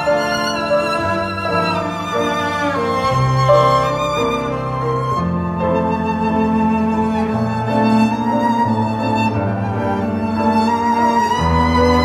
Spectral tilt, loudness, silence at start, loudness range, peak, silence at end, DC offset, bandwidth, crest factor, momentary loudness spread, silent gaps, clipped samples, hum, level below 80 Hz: -6.5 dB/octave; -17 LUFS; 0 s; 2 LU; -2 dBFS; 0 s; under 0.1%; 14 kHz; 14 dB; 5 LU; none; under 0.1%; none; -36 dBFS